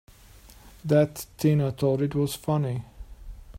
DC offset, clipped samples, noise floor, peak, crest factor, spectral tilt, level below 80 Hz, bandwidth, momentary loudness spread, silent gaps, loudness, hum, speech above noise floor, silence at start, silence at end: under 0.1%; under 0.1%; -51 dBFS; -8 dBFS; 18 dB; -7 dB/octave; -48 dBFS; 16 kHz; 15 LU; none; -26 LUFS; none; 26 dB; 0.45 s; 0 s